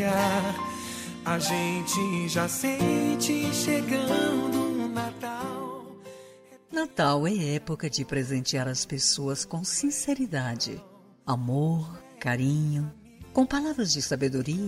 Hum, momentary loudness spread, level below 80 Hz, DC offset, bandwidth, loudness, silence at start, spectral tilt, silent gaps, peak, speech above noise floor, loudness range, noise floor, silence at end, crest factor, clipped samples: none; 9 LU; -58 dBFS; under 0.1%; 16 kHz; -27 LUFS; 0 s; -4.5 dB/octave; none; -12 dBFS; 25 dB; 4 LU; -52 dBFS; 0 s; 16 dB; under 0.1%